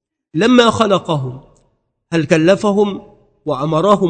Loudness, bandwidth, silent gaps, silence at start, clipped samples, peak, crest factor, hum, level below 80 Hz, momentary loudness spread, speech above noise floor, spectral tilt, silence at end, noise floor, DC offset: -14 LUFS; 9.4 kHz; none; 0.35 s; 0.2%; 0 dBFS; 16 dB; none; -50 dBFS; 15 LU; 49 dB; -6 dB/octave; 0 s; -62 dBFS; under 0.1%